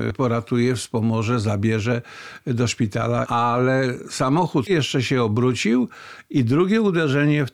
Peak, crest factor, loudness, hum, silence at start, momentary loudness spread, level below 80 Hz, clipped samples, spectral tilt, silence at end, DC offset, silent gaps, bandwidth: -10 dBFS; 10 dB; -21 LUFS; none; 0 s; 6 LU; -56 dBFS; under 0.1%; -6 dB/octave; 0.05 s; under 0.1%; none; 13 kHz